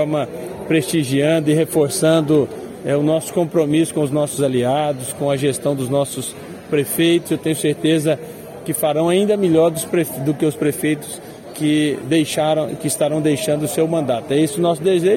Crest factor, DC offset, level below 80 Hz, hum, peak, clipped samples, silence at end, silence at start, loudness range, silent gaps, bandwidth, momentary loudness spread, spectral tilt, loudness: 14 dB; under 0.1%; -56 dBFS; none; -4 dBFS; under 0.1%; 0 s; 0 s; 2 LU; none; 17 kHz; 8 LU; -5.5 dB/octave; -18 LUFS